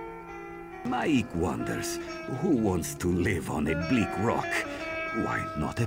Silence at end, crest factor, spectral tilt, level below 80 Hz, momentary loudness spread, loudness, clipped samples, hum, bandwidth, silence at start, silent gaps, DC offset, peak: 0 s; 16 dB; -5.5 dB/octave; -48 dBFS; 11 LU; -29 LUFS; under 0.1%; none; 16.5 kHz; 0 s; none; under 0.1%; -14 dBFS